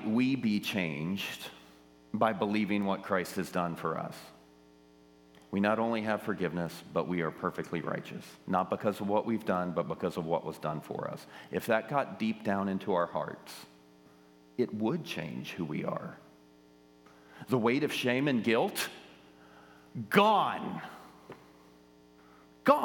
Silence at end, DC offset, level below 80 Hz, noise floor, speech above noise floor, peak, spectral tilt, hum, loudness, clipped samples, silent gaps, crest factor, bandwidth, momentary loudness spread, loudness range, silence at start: 0 s; under 0.1%; -74 dBFS; -60 dBFS; 28 dB; -8 dBFS; -6 dB/octave; none; -32 LUFS; under 0.1%; none; 24 dB; 19 kHz; 16 LU; 5 LU; 0 s